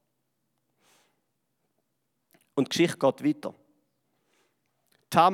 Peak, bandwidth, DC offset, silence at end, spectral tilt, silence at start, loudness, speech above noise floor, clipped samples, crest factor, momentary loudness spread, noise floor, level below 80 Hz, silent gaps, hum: -6 dBFS; 16.5 kHz; under 0.1%; 0 s; -5 dB/octave; 2.55 s; -27 LUFS; 53 dB; under 0.1%; 24 dB; 12 LU; -79 dBFS; -76 dBFS; none; none